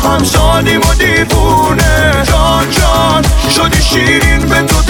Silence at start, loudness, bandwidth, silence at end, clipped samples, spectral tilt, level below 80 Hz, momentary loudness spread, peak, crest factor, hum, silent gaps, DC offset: 0 s; -9 LUFS; 20 kHz; 0 s; under 0.1%; -4 dB/octave; -14 dBFS; 1 LU; 0 dBFS; 8 dB; none; none; 0.3%